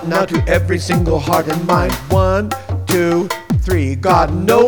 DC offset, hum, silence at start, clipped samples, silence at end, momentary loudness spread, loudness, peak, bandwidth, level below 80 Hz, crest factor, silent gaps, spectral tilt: 0.6%; none; 0 s; under 0.1%; 0 s; 5 LU; -16 LUFS; 0 dBFS; over 20 kHz; -26 dBFS; 14 dB; none; -6 dB/octave